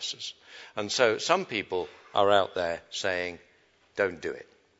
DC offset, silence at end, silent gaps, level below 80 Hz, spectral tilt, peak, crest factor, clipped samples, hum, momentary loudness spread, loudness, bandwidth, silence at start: under 0.1%; 0.35 s; none; -68 dBFS; -2.5 dB/octave; -6 dBFS; 24 dB; under 0.1%; none; 16 LU; -28 LUFS; 8 kHz; 0 s